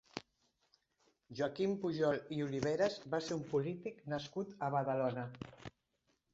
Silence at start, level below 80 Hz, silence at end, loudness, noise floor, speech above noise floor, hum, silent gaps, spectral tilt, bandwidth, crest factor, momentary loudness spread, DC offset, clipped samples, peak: 0.15 s; -72 dBFS; 0.65 s; -38 LUFS; -81 dBFS; 43 dB; none; none; -5.5 dB/octave; 8 kHz; 20 dB; 15 LU; under 0.1%; under 0.1%; -20 dBFS